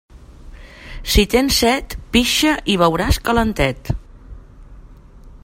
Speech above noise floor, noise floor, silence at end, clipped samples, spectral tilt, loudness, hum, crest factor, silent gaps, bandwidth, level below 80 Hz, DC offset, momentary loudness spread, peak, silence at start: 25 dB; -41 dBFS; 0.05 s; under 0.1%; -4 dB/octave; -17 LUFS; none; 18 dB; none; 16.5 kHz; -28 dBFS; under 0.1%; 13 LU; 0 dBFS; 0.15 s